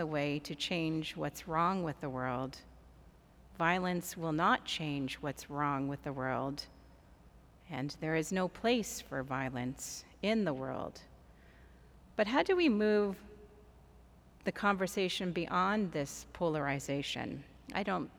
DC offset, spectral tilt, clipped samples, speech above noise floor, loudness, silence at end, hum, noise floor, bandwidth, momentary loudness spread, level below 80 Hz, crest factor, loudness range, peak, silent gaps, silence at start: under 0.1%; -5 dB/octave; under 0.1%; 25 dB; -35 LUFS; 0.05 s; none; -60 dBFS; over 20 kHz; 11 LU; -60 dBFS; 20 dB; 4 LU; -14 dBFS; none; 0 s